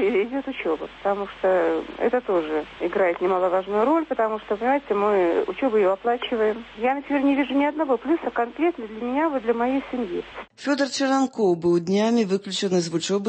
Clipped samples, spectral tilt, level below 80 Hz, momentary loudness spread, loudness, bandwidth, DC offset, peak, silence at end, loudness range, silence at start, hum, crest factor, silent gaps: under 0.1%; -5 dB/octave; -58 dBFS; 6 LU; -23 LUFS; 8.8 kHz; under 0.1%; -8 dBFS; 0 s; 2 LU; 0 s; none; 14 dB; none